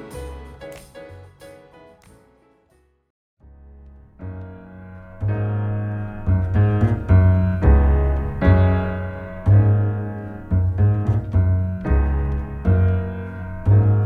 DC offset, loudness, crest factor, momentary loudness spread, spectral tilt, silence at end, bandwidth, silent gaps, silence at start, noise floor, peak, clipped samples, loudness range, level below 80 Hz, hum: under 0.1%; -20 LUFS; 16 dB; 22 LU; -10 dB/octave; 0 s; 4 kHz; 3.10-3.37 s; 0 s; -60 dBFS; -2 dBFS; under 0.1%; 12 LU; -26 dBFS; none